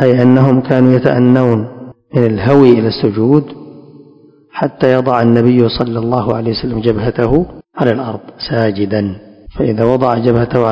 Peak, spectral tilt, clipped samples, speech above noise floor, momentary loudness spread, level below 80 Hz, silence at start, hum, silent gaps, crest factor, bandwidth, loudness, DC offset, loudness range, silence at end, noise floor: 0 dBFS; -9.5 dB/octave; 1%; 32 dB; 12 LU; -38 dBFS; 0 s; none; none; 12 dB; 5.8 kHz; -12 LUFS; under 0.1%; 5 LU; 0 s; -44 dBFS